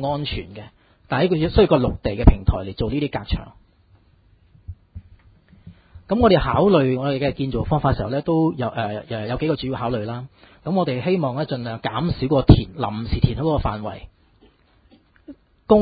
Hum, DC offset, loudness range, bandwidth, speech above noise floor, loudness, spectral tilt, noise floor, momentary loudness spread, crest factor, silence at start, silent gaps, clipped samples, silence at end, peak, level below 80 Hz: none; under 0.1%; 6 LU; 5 kHz; 36 dB; -21 LUFS; -11 dB/octave; -56 dBFS; 15 LU; 22 dB; 0 s; none; under 0.1%; 0 s; 0 dBFS; -30 dBFS